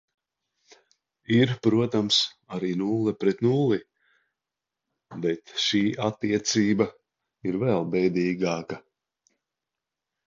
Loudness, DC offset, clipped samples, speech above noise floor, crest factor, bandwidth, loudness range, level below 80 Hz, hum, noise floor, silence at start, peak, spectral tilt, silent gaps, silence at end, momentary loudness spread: -25 LUFS; under 0.1%; under 0.1%; 63 dB; 20 dB; 7.8 kHz; 4 LU; -64 dBFS; none; -88 dBFS; 1.3 s; -8 dBFS; -5 dB/octave; none; 1.5 s; 9 LU